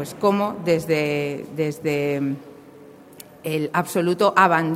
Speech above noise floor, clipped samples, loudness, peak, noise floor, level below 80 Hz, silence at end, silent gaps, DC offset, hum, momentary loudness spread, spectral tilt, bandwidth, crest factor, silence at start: 24 dB; under 0.1%; -22 LUFS; -2 dBFS; -45 dBFS; -62 dBFS; 0 s; none; under 0.1%; none; 11 LU; -6 dB/octave; 16.5 kHz; 20 dB; 0 s